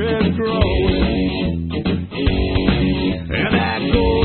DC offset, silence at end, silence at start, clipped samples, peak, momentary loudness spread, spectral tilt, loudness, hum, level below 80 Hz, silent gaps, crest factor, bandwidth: under 0.1%; 0 s; 0 s; under 0.1%; 0 dBFS; 5 LU; -12 dB/octave; -18 LUFS; none; -26 dBFS; none; 16 dB; 4.4 kHz